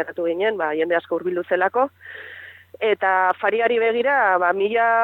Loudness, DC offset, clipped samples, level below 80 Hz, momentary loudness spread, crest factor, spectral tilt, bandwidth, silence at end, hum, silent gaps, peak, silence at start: -20 LUFS; under 0.1%; under 0.1%; -78 dBFS; 13 LU; 16 dB; -6.5 dB/octave; 4.4 kHz; 0 s; none; none; -6 dBFS; 0 s